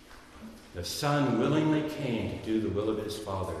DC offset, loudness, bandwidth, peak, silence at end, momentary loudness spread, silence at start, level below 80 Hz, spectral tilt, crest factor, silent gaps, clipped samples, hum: under 0.1%; -30 LUFS; 13.5 kHz; -16 dBFS; 0 s; 17 LU; 0 s; -56 dBFS; -6 dB/octave; 16 dB; none; under 0.1%; none